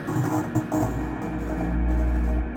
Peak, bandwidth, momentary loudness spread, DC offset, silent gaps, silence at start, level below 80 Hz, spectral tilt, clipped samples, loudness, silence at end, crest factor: -12 dBFS; 17 kHz; 5 LU; under 0.1%; none; 0 s; -28 dBFS; -7.5 dB/octave; under 0.1%; -26 LUFS; 0 s; 14 dB